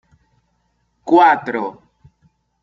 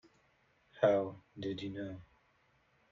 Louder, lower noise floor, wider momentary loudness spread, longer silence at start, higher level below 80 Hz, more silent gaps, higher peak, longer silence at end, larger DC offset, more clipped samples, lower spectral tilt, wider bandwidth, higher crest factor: first, -15 LUFS vs -36 LUFS; second, -66 dBFS vs -72 dBFS; first, 18 LU vs 15 LU; first, 1.05 s vs 0.75 s; first, -62 dBFS vs -72 dBFS; neither; first, -2 dBFS vs -16 dBFS; about the same, 0.9 s vs 0.85 s; neither; neither; about the same, -6 dB/octave vs -5 dB/octave; about the same, 7.4 kHz vs 7.2 kHz; second, 18 dB vs 24 dB